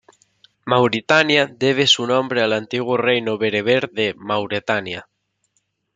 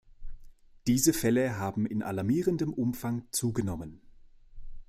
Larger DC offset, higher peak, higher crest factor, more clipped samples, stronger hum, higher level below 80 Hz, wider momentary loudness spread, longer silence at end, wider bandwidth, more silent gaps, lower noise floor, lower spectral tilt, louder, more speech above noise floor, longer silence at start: neither; first, -2 dBFS vs -12 dBFS; about the same, 18 dB vs 20 dB; neither; neither; second, -64 dBFS vs -50 dBFS; about the same, 9 LU vs 10 LU; first, 0.95 s vs 0.05 s; second, 9.4 kHz vs 15.5 kHz; neither; first, -69 dBFS vs -53 dBFS; about the same, -4 dB/octave vs -5 dB/octave; first, -18 LUFS vs -30 LUFS; first, 51 dB vs 24 dB; first, 0.65 s vs 0.2 s